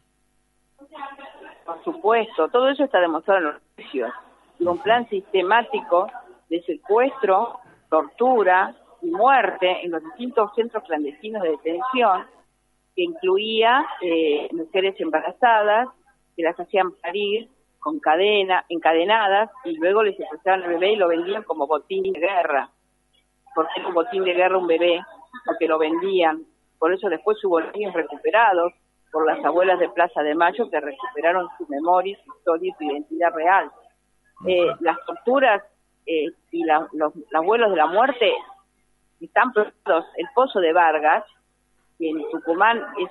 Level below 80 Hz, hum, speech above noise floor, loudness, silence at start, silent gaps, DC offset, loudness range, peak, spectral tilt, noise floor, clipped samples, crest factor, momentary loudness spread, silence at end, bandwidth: -72 dBFS; none; 46 dB; -21 LUFS; 0.95 s; none; under 0.1%; 3 LU; -2 dBFS; -6 dB/octave; -66 dBFS; under 0.1%; 20 dB; 11 LU; 0 s; 4.3 kHz